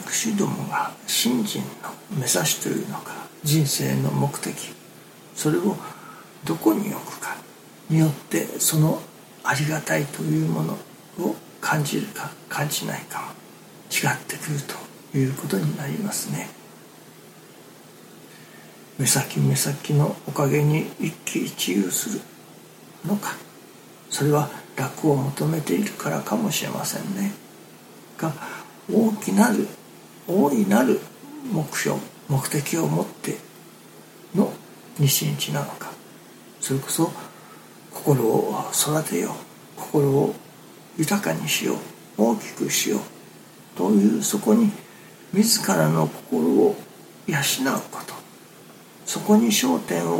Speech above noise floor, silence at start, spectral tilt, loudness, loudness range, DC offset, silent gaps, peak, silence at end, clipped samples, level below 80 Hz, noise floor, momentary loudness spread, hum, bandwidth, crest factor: 24 dB; 0 s; -4.5 dB/octave; -23 LUFS; 5 LU; under 0.1%; none; -4 dBFS; 0 s; under 0.1%; -68 dBFS; -46 dBFS; 18 LU; none; 17 kHz; 20 dB